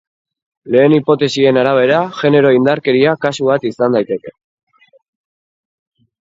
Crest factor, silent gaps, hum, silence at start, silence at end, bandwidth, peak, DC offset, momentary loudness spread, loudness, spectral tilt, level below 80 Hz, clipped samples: 14 dB; none; none; 0.65 s; 1.9 s; 7.8 kHz; 0 dBFS; under 0.1%; 5 LU; -13 LUFS; -6.5 dB/octave; -60 dBFS; under 0.1%